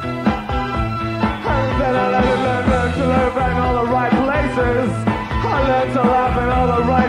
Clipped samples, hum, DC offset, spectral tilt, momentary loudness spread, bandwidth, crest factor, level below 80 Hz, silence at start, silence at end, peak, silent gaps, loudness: under 0.1%; none; under 0.1%; -7.5 dB/octave; 5 LU; 11.5 kHz; 14 dB; -28 dBFS; 0 s; 0 s; -2 dBFS; none; -17 LUFS